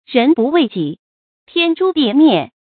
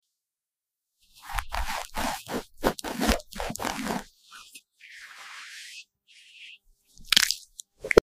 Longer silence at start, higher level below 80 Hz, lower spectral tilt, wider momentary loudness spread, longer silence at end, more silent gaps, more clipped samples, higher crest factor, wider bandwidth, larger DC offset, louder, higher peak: second, 0.1 s vs 1.25 s; second, -64 dBFS vs -42 dBFS; first, -10.5 dB/octave vs -2.5 dB/octave; second, 10 LU vs 24 LU; first, 0.3 s vs 0.05 s; first, 0.99-1.47 s vs none; neither; second, 14 dB vs 28 dB; second, 4.6 kHz vs 16 kHz; neither; first, -14 LUFS vs -28 LUFS; about the same, 0 dBFS vs -2 dBFS